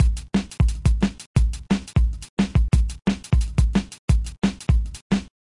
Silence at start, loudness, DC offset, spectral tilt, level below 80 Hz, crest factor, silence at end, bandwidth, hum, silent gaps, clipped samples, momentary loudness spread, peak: 0 s; -23 LUFS; under 0.1%; -6.5 dB/octave; -24 dBFS; 16 dB; 0.2 s; 11.5 kHz; none; 1.26-1.34 s, 2.29-2.37 s, 3.99-4.08 s, 5.02-5.10 s; under 0.1%; 5 LU; -6 dBFS